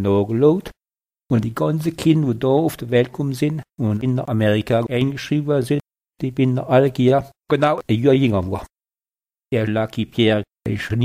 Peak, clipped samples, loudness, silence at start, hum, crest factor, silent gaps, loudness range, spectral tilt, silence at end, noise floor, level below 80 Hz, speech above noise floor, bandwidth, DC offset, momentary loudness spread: -2 dBFS; under 0.1%; -19 LUFS; 0 s; none; 18 dB; none; 2 LU; -7.5 dB/octave; 0 s; under -90 dBFS; -50 dBFS; over 72 dB; 16 kHz; under 0.1%; 8 LU